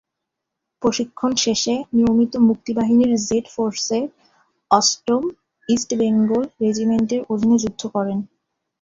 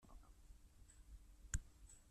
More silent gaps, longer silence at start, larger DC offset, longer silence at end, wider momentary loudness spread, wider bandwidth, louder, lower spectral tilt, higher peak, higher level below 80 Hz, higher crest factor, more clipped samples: neither; first, 0.8 s vs 0 s; neither; first, 0.55 s vs 0 s; second, 8 LU vs 18 LU; second, 7.8 kHz vs 13.5 kHz; first, -19 LUFS vs -54 LUFS; first, -4.5 dB/octave vs -3 dB/octave; first, -2 dBFS vs -28 dBFS; about the same, -54 dBFS vs -58 dBFS; second, 18 dB vs 26 dB; neither